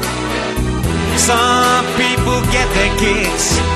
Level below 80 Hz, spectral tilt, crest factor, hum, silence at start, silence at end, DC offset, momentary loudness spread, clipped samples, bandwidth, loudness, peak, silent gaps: -24 dBFS; -3.5 dB/octave; 14 dB; none; 0 s; 0 s; under 0.1%; 7 LU; under 0.1%; 13 kHz; -14 LUFS; 0 dBFS; none